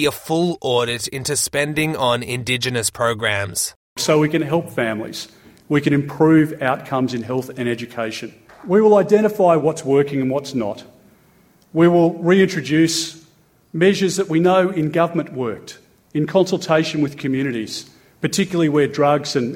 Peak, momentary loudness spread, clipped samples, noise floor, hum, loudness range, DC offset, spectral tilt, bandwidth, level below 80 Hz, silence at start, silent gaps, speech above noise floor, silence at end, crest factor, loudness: -2 dBFS; 12 LU; under 0.1%; -54 dBFS; none; 3 LU; under 0.1%; -5 dB/octave; 17.5 kHz; -56 dBFS; 0 s; 3.76-3.96 s; 36 dB; 0 s; 16 dB; -18 LUFS